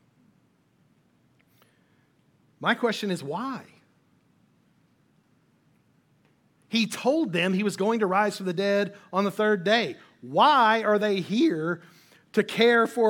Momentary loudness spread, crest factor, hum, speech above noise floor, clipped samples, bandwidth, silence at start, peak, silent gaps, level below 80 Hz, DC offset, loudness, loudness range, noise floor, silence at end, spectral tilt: 11 LU; 20 dB; none; 41 dB; under 0.1%; 17.5 kHz; 2.6 s; -8 dBFS; none; -78 dBFS; under 0.1%; -24 LUFS; 11 LU; -65 dBFS; 0 s; -5 dB/octave